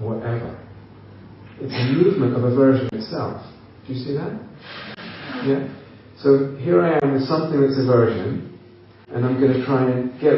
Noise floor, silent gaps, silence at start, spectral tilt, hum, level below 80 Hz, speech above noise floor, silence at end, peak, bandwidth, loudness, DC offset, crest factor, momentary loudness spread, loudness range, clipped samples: -46 dBFS; none; 0 s; -7 dB/octave; none; -58 dBFS; 27 dB; 0 s; -2 dBFS; 5.8 kHz; -20 LUFS; under 0.1%; 18 dB; 18 LU; 5 LU; under 0.1%